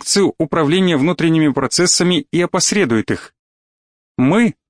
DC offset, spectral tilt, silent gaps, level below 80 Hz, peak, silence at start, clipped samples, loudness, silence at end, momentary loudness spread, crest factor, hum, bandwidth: 0.2%; -4 dB/octave; 3.39-4.15 s; -52 dBFS; -2 dBFS; 0 s; under 0.1%; -15 LUFS; 0.15 s; 5 LU; 12 dB; none; 10.5 kHz